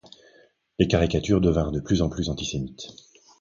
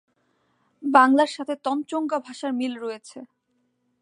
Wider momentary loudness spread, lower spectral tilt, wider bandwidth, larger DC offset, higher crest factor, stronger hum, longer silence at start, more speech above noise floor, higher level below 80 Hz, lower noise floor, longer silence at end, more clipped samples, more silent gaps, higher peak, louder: about the same, 17 LU vs 19 LU; first, -6 dB/octave vs -3.5 dB/octave; second, 7.4 kHz vs 11 kHz; neither; about the same, 20 dB vs 22 dB; neither; about the same, 0.8 s vs 0.8 s; second, 35 dB vs 49 dB; first, -38 dBFS vs -84 dBFS; second, -58 dBFS vs -72 dBFS; second, 0.5 s vs 0.75 s; neither; neither; about the same, -4 dBFS vs -2 dBFS; about the same, -24 LUFS vs -23 LUFS